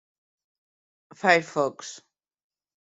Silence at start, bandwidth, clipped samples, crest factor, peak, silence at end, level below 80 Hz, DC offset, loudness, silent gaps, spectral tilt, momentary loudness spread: 1.25 s; 8.2 kHz; under 0.1%; 24 dB; -4 dBFS; 1 s; -74 dBFS; under 0.1%; -24 LUFS; none; -4 dB/octave; 19 LU